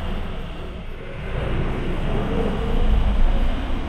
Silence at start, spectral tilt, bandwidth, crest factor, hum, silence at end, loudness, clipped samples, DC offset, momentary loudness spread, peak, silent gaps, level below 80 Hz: 0 s; -7.5 dB/octave; 5.2 kHz; 14 dB; none; 0 s; -26 LUFS; under 0.1%; under 0.1%; 11 LU; -8 dBFS; none; -22 dBFS